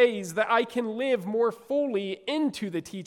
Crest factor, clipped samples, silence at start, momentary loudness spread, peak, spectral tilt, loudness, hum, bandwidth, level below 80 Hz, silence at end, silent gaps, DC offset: 18 dB; under 0.1%; 0 s; 6 LU; -10 dBFS; -5 dB/octave; -27 LUFS; none; 15 kHz; -74 dBFS; 0 s; none; under 0.1%